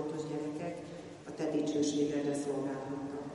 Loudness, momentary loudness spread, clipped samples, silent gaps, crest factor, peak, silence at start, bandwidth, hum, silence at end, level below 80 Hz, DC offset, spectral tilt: -36 LUFS; 13 LU; under 0.1%; none; 16 dB; -20 dBFS; 0 s; 11.5 kHz; none; 0 s; -70 dBFS; under 0.1%; -5.5 dB/octave